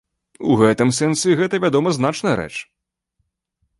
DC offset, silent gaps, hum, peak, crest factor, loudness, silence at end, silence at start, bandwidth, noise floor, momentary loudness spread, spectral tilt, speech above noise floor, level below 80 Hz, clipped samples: under 0.1%; none; none; -2 dBFS; 16 dB; -18 LUFS; 1.15 s; 0.4 s; 11.5 kHz; -72 dBFS; 10 LU; -5 dB/octave; 55 dB; -54 dBFS; under 0.1%